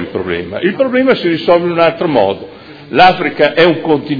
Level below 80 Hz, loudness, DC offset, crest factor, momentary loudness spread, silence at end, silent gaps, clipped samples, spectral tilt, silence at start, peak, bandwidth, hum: -46 dBFS; -12 LUFS; under 0.1%; 12 dB; 9 LU; 0 s; none; 0.4%; -7.5 dB/octave; 0 s; 0 dBFS; 5.4 kHz; none